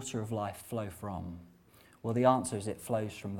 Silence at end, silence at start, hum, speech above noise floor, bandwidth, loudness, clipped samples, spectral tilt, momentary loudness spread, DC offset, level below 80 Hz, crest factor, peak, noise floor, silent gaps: 0 s; 0 s; none; 28 dB; 18 kHz; -34 LUFS; under 0.1%; -6 dB/octave; 15 LU; under 0.1%; -62 dBFS; 22 dB; -12 dBFS; -61 dBFS; none